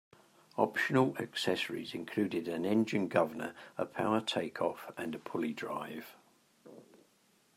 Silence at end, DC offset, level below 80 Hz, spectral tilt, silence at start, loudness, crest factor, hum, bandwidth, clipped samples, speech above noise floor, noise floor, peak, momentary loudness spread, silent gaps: 0.75 s; under 0.1%; -80 dBFS; -5.5 dB/octave; 0.55 s; -34 LUFS; 24 dB; none; 16 kHz; under 0.1%; 35 dB; -70 dBFS; -12 dBFS; 11 LU; none